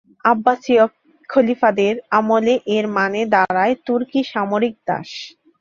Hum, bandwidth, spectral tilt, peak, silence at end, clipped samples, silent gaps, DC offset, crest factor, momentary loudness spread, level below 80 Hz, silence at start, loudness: none; 7.4 kHz; -6 dB/octave; 0 dBFS; 0.3 s; under 0.1%; none; under 0.1%; 18 dB; 8 LU; -62 dBFS; 0.25 s; -18 LUFS